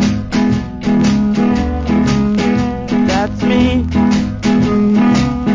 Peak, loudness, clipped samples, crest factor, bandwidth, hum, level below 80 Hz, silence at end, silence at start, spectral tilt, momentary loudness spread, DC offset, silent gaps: 0 dBFS; -14 LUFS; under 0.1%; 12 dB; 7.6 kHz; none; -26 dBFS; 0 s; 0 s; -6.5 dB/octave; 4 LU; under 0.1%; none